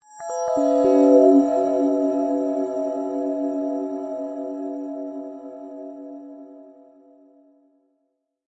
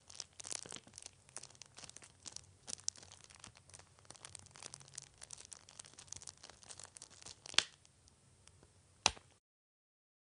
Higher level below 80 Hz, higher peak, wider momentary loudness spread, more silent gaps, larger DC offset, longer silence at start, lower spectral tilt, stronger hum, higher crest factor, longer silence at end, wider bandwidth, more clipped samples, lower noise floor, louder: about the same, -68 dBFS vs -72 dBFS; first, -4 dBFS vs -8 dBFS; about the same, 22 LU vs 22 LU; neither; neither; first, 0.15 s vs 0 s; first, -6 dB/octave vs 0 dB/octave; neither; second, 18 dB vs 40 dB; first, 1.75 s vs 1.05 s; second, 8 kHz vs 10.5 kHz; neither; first, -74 dBFS vs -68 dBFS; first, -21 LUFS vs -44 LUFS